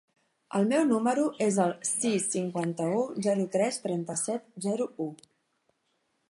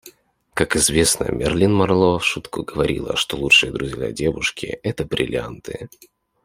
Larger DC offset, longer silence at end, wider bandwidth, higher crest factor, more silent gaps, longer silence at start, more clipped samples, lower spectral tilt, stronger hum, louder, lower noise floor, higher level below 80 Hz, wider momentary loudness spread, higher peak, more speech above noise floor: neither; first, 1.15 s vs 0.6 s; second, 11.5 kHz vs 16 kHz; about the same, 18 dB vs 20 dB; neither; first, 0.5 s vs 0.05 s; neither; first, -5 dB/octave vs -3.5 dB/octave; neither; second, -29 LUFS vs -19 LUFS; first, -75 dBFS vs -51 dBFS; second, -80 dBFS vs -42 dBFS; second, 8 LU vs 15 LU; second, -12 dBFS vs -2 dBFS; first, 47 dB vs 31 dB